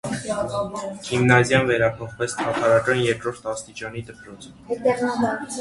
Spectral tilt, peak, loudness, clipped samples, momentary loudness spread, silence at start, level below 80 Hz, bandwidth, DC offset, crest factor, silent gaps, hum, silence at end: -5 dB/octave; 0 dBFS; -22 LUFS; under 0.1%; 16 LU; 0.05 s; -52 dBFS; 11.5 kHz; under 0.1%; 22 dB; none; none; 0 s